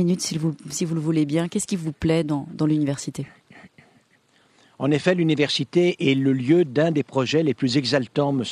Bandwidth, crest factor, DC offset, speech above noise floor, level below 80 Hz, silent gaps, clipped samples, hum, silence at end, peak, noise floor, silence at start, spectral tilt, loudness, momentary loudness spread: 13.5 kHz; 18 dB; under 0.1%; 39 dB; -54 dBFS; none; under 0.1%; none; 0 s; -4 dBFS; -61 dBFS; 0 s; -5.5 dB/octave; -22 LUFS; 8 LU